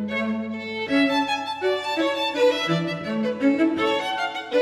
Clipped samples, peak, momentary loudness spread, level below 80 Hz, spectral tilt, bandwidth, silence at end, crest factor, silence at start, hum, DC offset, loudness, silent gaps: under 0.1%; -8 dBFS; 6 LU; -66 dBFS; -5 dB/octave; 13.5 kHz; 0 s; 14 dB; 0 s; none; under 0.1%; -23 LUFS; none